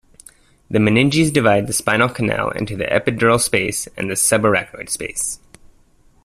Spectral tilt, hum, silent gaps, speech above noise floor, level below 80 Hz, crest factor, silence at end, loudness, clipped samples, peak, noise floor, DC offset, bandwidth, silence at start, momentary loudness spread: -4 dB/octave; none; none; 35 dB; -46 dBFS; 18 dB; 0.9 s; -17 LUFS; under 0.1%; -2 dBFS; -52 dBFS; under 0.1%; 15.5 kHz; 0.7 s; 9 LU